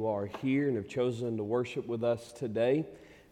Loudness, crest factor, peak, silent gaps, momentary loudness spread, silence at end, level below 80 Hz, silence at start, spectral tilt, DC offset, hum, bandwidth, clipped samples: -32 LUFS; 14 dB; -18 dBFS; none; 6 LU; 0.15 s; -68 dBFS; 0 s; -7.5 dB/octave; under 0.1%; none; 12 kHz; under 0.1%